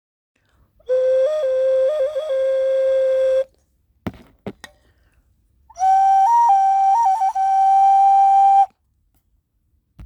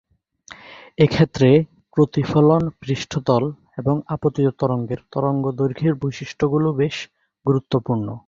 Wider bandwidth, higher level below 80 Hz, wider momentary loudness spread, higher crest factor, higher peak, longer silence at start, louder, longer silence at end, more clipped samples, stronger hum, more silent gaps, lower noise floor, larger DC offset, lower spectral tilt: first, 10.5 kHz vs 7.4 kHz; second, -58 dBFS vs -50 dBFS; first, 21 LU vs 11 LU; second, 10 dB vs 18 dB; second, -6 dBFS vs -2 dBFS; first, 0.9 s vs 0.5 s; first, -16 LUFS vs -20 LUFS; about the same, 0 s vs 0.1 s; neither; neither; neither; first, -66 dBFS vs -46 dBFS; neither; second, -4.5 dB/octave vs -7.5 dB/octave